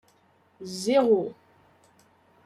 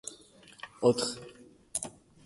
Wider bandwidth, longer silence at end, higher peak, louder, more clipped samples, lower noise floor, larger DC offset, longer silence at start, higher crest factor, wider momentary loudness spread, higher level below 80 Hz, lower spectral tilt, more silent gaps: first, 14 kHz vs 12 kHz; first, 1.15 s vs 0.35 s; about the same, -8 dBFS vs -10 dBFS; first, -24 LUFS vs -31 LUFS; neither; first, -63 dBFS vs -56 dBFS; neither; first, 0.6 s vs 0.05 s; about the same, 20 dB vs 24 dB; second, 18 LU vs 22 LU; second, -74 dBFS vs -68 dBFS; about the same, -5 dB/octave vs -4 dB/octave; neither